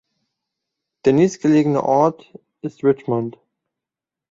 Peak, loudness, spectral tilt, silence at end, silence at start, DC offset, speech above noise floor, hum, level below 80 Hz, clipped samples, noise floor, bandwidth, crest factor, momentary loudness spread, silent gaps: -2 dBFS; -18 LUFS; -7.5 dB/octave; 1 s; 1.05 s; under 0.1%; 70 dB; none; -62 dBFS; under 0.1%; -87 dBFS; 7.8 kHz; 18 dB; 13 LU; none